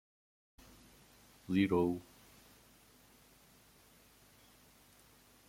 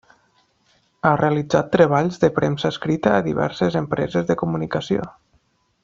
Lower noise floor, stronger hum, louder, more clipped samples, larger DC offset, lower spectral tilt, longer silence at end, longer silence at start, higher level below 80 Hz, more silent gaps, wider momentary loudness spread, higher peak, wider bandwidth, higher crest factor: about the same, -64 dBFS vs -63 dBFS; neither; second, -34 LUFS vs -20 LUFS; neither; neither; about the same, -7 dB/octave vs -7 dB/octave; first, 3.45 s vs 0.75 s; first, 1.5 s vs 1.05 s; second, -70 dBFS vs -52 dBFS; neither; first, 29 LU vs 7 LU; second, -18 dBFS vs -2 dBFS; first, 16.5 kHz vs 7.6 kHz; first, 24 dB vs 18 dB